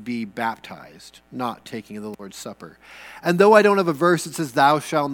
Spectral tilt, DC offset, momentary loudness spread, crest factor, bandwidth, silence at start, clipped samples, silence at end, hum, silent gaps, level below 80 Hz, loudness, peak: -5 dB/octave; under 0.1%; 23 LU; 22 dB; 18.5 kHz; 0 s; under 0.1%; 0 s; none; none; -64 dBFS; -19 LUFS; 0 dBFS